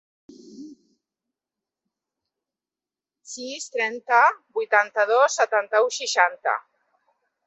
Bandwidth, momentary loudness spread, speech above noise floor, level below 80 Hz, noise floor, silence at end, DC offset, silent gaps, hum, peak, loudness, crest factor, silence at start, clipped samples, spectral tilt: 8.4 kHz; 16 LU; over 68 dB; -84 dBFS; under -90 dBFS; 0.85 s; under 0.1%; none; none; -2 dBFS; -21 LUFS; 22 dB; 0.5 s; under 0.1%; 0.5 dB/octave